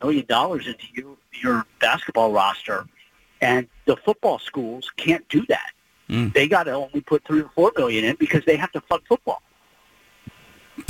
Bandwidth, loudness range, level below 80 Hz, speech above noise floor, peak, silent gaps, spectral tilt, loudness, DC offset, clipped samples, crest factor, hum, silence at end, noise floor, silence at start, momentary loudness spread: 17 kHz; 3 LU; -56 dBFS; 36 dB; -4 dBFS; none; -5.5 dB/octave; -22 LUFS; under 0.1%; under 0.1%; 18 dB; none; 0.05 s; -58 dBFS; 0 s; 11 LU